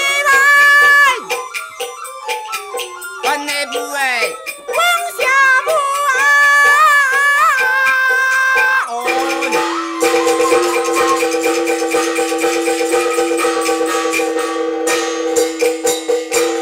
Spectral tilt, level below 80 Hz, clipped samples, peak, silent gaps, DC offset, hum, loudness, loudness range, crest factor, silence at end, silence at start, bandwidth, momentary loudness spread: -0.5 dB/octave; -58 dBFS; under 0.1%; -2 dBFS; none; under 0.1%; none; -13 LUFS; 6 LU; 12 dB; 0 s; 0 s; 16.5 kHz; 13 LU